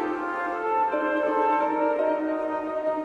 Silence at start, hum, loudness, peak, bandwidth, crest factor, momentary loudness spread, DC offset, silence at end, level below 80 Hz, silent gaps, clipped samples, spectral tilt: 0 s; none; -25 LUFS; -12 dBFS; 8.4 kHz; 12 dB; 5 LU; under 0.1%; 0 s; -64 dBFS; none; under 0.1%; -6 dB/octave